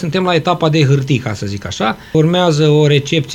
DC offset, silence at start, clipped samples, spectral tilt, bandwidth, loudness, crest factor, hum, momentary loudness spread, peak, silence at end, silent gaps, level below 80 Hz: under 0.1%; 0 s; under 0.1%; -6 dB/octave; 9.4 kHz; -14 LUFS; 14 dB; none; 8 LU; 0 dBFS; 0 s; none; -46 dBFS